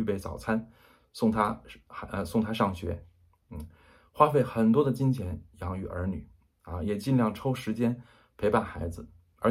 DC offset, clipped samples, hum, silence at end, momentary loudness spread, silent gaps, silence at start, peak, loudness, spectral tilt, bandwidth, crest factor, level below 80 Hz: under 0.1%; under 0.1%; none; 0 s; 19 LU; none; 0 s; -6 dBFS; -29 LUFS; -7.5 dB/octave; 15.5 kHz; 22 dB; -50 dBFS